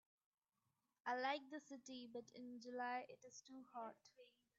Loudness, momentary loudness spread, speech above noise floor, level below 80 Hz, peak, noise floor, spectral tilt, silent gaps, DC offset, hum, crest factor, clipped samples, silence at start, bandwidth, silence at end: -51 LUFS; 15 LU; over 39 dB; under -90 dBFS; -30 dBFS; under -90 dBFS; -0.5 dB/octave; none; under 0.1%; none; 22 dB; under 0.1%; 1.05 s; 7.6 kHz; 0.3 s